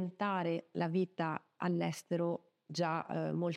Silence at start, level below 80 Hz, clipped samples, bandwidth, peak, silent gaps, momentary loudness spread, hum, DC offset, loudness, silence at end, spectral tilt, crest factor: 0 s; -88 dBFS; under 0.1%; 13 kHz; -20 dBFS; none; 4 LU; none; under 0.1%; -37 LUFS; 0 s; -6.5 dB/octave; 16 dB